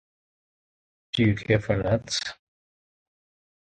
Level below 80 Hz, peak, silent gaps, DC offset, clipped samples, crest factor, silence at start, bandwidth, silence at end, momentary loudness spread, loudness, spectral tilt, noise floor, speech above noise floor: -50 dBFS; -6 dBFS; none; under 0.1%; under 0.1%; 22 dB; 1.15 s; 9.2 kHz; 1.45 s; 8 LU; -25 LUFS; -5.5 dB/octave; under -90 dBFS; over 66 dB